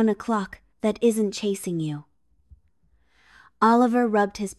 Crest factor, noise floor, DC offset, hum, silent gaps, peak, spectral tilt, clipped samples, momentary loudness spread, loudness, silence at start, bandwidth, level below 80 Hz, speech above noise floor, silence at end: 18 dB; -66 dBFS; under 0.1%; none; none; -6 dBFS; -5.5 dB/octave; under 0.1%; 11 LU; -23 LUFS; 0 s; 13 kHz; -60 dBFS; 43 dB; 0.05 s